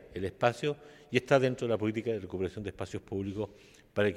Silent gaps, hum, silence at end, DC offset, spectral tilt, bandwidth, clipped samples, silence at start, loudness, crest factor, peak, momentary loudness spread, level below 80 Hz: none; none; 0 s; under 0.1%; -6.5 dB/octave; 13.5 kHz; under 0.1%; 0 s; -32 LUFS; 22 dB; -10 dBFS; 12 LU; -62 dBFS